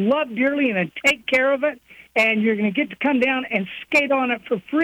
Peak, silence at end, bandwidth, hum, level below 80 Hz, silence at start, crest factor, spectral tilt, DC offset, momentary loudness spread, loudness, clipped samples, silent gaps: -8 dBFS; 0 s; 18.5 kHz; none; -62 dBFS; 0 s; 14 dB; -5 dB/octave; under 0.1%; 7 LU; -20 LUFS; under 0.1%; none